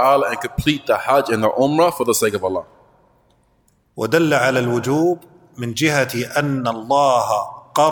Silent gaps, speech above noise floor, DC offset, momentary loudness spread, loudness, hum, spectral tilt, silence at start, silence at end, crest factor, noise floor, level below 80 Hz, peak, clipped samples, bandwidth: none; 42 dB; under 0.1%; 8 LU; -18 LUFS; none; -4.5 dB/octave; 0 s; 0 s; 16 dB; -60 dBFS; -46 dBFS; -2 dBFS; under 0.1%; 19 kHz